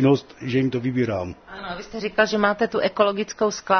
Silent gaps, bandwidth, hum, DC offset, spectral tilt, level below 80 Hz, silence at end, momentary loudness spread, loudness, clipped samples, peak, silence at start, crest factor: none; 6.6 kHz; none; under 0.1%; -5.5 dB/octave; -56 dBFS; 0 s; 13 LU; -23 LUFS; under 0.1%; -2 dBFS; 0 s; 20 dB